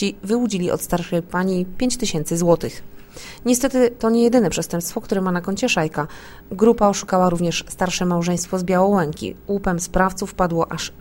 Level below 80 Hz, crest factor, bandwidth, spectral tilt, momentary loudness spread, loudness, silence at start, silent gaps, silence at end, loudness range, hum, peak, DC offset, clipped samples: -40 dBFS; 18 dB; 16.5 kHz; -5 dB/octave; 9 LU; -20 LUFS; 0 s; none; 0 s; 2 LU; none; -2 dBFS; under 0.1%; under 0.1%